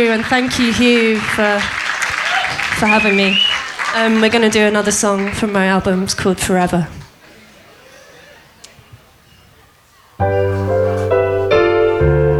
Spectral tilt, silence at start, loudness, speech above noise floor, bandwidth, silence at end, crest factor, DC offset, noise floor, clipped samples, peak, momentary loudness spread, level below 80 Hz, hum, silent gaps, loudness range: -4 dB/octave; 0 s; -14 LUFS; 35 dB; 16 kHz; 0 s; 16 dB; under 0.1%; -48 dBFS; under 0.1%; 0 dBFS; 6 LU; -36 dBFS; none; none; 10 LU